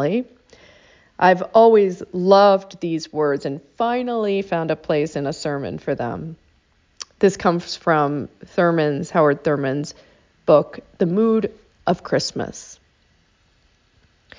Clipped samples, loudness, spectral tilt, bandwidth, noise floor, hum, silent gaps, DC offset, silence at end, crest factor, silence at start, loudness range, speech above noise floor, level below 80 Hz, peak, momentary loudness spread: under 0.1%; -19 LUFS; -6 dB/octave; 7.6 kHz; -60 dBFS; none; none; under 0.1%; 1.65 s; 18 dB; 0 s; 7 LU; 41 dB; -56 dBFS; -2 dBFS; 15 LU